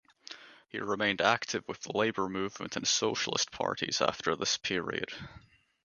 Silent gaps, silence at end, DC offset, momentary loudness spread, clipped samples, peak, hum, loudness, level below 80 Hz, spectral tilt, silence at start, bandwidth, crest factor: none; 0.45 s; under 0.1%; 16 LU; under 0.1%; -8 dBFS; none; -31 LUFS; -66 dBFS; -2.5 dB/octave; 0.3 s; 10 kHz; 24 dB